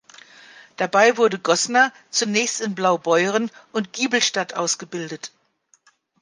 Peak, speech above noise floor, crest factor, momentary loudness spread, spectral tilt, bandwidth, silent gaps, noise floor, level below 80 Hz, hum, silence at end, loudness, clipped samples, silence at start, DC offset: -2 dBFS; 42 dB; 20 dB; 12 LU; -2.5 dB/octave; 10.5 kHz; none; -62 dBFS; -74 dBFS; none; 0.95 s; -20 LUFS; under 0.1%; 0.8 s; under 0.1%